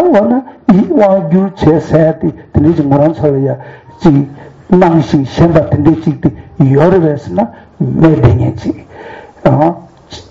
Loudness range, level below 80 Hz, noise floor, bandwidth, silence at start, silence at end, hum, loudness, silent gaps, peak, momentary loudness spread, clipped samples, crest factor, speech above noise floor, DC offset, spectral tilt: 2 LU; -32 dBFS; -30 dBFS; 7.6 kHz; 0 s; 0.1 s; none; -10 LUFS; none; 0 dBFS; 11 LU; 0.4%; 10 dB; 21 dB; under 0.1%; -9.5 dB/octave